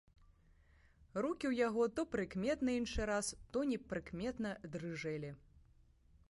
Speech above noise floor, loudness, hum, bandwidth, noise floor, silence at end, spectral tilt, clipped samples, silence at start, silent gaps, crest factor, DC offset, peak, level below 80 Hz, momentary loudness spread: 29 dB; -40 LUFS; none; 11.5 kHz; -68 dBFS; 0.7 s; -5 dB/octave; under 0.1%; 1 s; none; 18 dB; under 0.1%; -24 dBFS; -58 dBFS; 9 LU